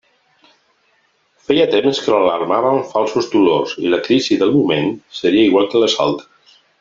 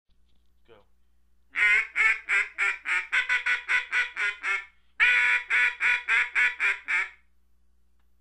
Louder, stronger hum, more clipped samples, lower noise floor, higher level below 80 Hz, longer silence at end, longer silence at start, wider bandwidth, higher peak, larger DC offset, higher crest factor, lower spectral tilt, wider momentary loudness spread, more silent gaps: first, -15 LUFS vs -23 LUFS; neither; neither; second, -60 dBFS vs -68 dBFS; about the same, -58 dBFS vs -62 dBFS; second, 0.6 s vs 1.1 s; about the same, 1.5 s vs 1.55 s; second, 7.6 kHz vs 11 kHz; first, 0 dBFS vs -8 dBFS; neither; about the same, 16 dB vs 20 dB; first, -5 dB/octave vs 1 dB/octave; about the same, 5 LU vs 7 LU; neither